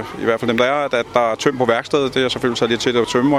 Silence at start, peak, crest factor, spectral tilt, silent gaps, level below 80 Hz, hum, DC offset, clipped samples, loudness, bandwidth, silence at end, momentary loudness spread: 0 s; 0 dBFS; 16 dB; -4.5 dB/octave; none; -50 dBFS; none; under 0.1%; under 0.1%; -18 LUFS; 14.5 kHz; 0 s; 2 LU